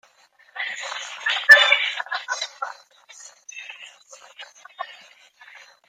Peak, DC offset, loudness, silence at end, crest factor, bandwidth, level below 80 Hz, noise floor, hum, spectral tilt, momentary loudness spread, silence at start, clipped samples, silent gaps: 0 dBFS; under 0.1%; -18 LUFS; 0.3 s; 24 dB; 16 kHz; -76 dBFS; -57 dBFS; none; 3 dB/octave; 29 LU; 0.55 s; under 0.1%; none